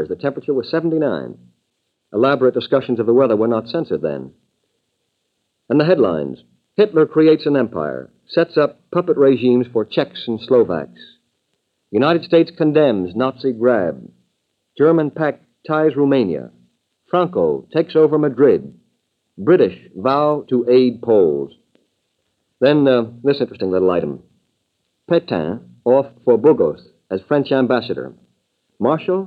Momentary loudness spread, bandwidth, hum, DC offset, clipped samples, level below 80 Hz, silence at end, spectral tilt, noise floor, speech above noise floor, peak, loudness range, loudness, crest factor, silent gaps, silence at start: 12 LU; 5.2 kHz; none; under 0.1%; under 0.1%; -62 dBFS; 0 s; -9 dB/octave; -72 dBFS; 55 dB; 0 dBFS; 3 LU; -17 LUFS; 16 dB; none; 0 s